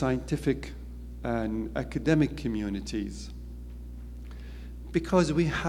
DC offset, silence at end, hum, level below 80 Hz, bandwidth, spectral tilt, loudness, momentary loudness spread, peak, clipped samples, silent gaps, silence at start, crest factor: under 0.1%; 0 s; 60 Hz at -40 dBFS; -40 dBFS; 15.5 kHz; -6.5 dB/octave; -29 LUFS; 18 LU; -10 dBFS; under 0.1%; none; 0 s; 20 dB